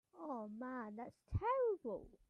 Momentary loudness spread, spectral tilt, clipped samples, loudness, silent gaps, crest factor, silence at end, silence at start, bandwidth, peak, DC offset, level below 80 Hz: 11 LU; -9.5 dB/octave; under 0.1%; -43 LUFS; none; 14 dB; 0.2 s; 0.15 s; 6.4 kHz; -28 dBFS; under 0.1%; -60 dBFS